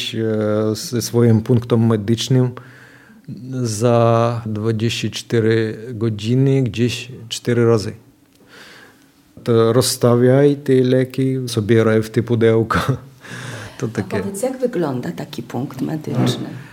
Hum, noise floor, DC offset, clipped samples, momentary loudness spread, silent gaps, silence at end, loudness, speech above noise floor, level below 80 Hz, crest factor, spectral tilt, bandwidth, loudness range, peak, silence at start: none; -50 dBFS; under 0.1%; under 0.1%; 13 LU; none; 0 s; -18 LUFS; 33 dB; -54 dBFS; 16 dB; -6 dB/octave; 16.5 kHz; 6 LU; -2 dBFS; 0 s